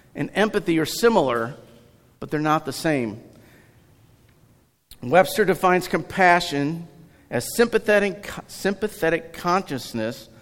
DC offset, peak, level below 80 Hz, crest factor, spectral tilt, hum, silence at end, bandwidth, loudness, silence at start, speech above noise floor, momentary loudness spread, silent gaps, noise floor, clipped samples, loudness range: under 0.1%; -2 dBFS; -52 dBFS; 22 dB; -5 dB/octave; none; 0.2 s; 17 kHz; -22 LUFS; 0.15 s; 37 dB; 13 LU; none; -58 dBFS; under 0.1%; 7 LU